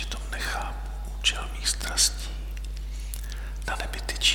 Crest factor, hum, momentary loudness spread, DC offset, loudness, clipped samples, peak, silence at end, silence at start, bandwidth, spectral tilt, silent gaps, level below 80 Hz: 22 dB; none; 14 LU; under 0.1%; -29 LUFS; under 0.1%; -8 dBFS; 0 s; 0 s; 18.5 kHz; -1 dB/octave; none; -32 dBFS